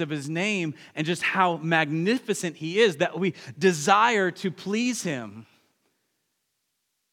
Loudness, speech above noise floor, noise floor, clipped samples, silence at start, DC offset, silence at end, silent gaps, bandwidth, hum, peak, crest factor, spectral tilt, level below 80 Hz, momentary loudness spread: -25 LUFS; 52 dB; -77 dBFS; under 0.1%; 0 s; under 0.1%; 1.7 s; none; 17 kHz; none; -4 dBFS; 22 dB; -4.5 dB/octave; -82 dBFS; 11 LU